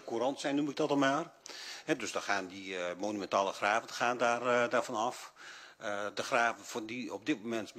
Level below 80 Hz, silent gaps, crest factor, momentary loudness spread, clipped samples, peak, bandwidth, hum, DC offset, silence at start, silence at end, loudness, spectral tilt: -82 dBFS; none; 20 dB; 13 LU; under 0.1%; -14 dBFS; 15 kHz; none; under 0.1%; 0 s; 0 s; -34 LUFS; -3.5 dB/octave